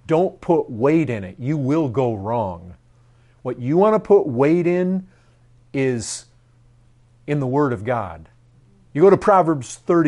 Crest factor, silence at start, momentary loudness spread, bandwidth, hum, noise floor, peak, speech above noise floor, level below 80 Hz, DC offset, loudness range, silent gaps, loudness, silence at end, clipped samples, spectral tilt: 16 dB; 0.1 s; 14 LU; 11.5 kHz; none; -53 dBFS; -4 dBFS; 35 dB; -54 dBFS; under 0.1%; 5 LU; none; -19 LUFS; 0 s; under 0.1%; -7 dB/octave